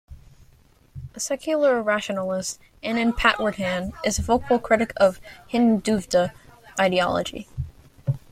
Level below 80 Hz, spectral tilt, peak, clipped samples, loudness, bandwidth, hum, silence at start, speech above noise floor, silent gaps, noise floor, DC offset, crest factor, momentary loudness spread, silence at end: -44 dBFS; -4.5 dB/octave; -2 dBFS; under 0.1%; -23 LUFS; 15.5 kHz; none; 0.1 s; 33 dB; none; -55 dBFS; under 0.1%; 22 dB; 13 LU; 0.15 s